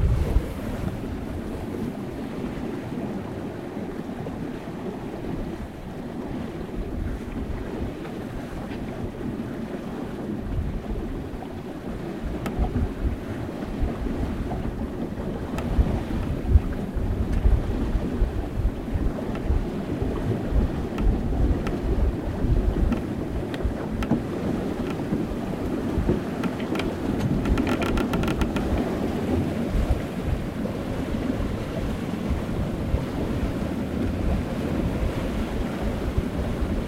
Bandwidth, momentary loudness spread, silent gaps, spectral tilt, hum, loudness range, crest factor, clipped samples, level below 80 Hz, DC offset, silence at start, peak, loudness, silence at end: 16 kHz; 8 LU; none; -7.5 dB/octave; none; 7 LU; 22 dB; under 0.1%; -30 dBFS; 0.2%; 0 s; -4 dBFS; -28 LUFS; 0 s